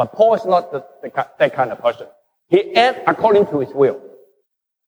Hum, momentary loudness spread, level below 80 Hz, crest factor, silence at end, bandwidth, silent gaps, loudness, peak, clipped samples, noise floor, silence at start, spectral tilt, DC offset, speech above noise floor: none; 13 LU; -64 dBFS; 16 dB; 0.8 s; 20 kHz; none; -17 LUFS; -2 dBFS; under 0.1%; -71 dBFS; 0 s; -6 dB/octave; under 0.1%; 54 dB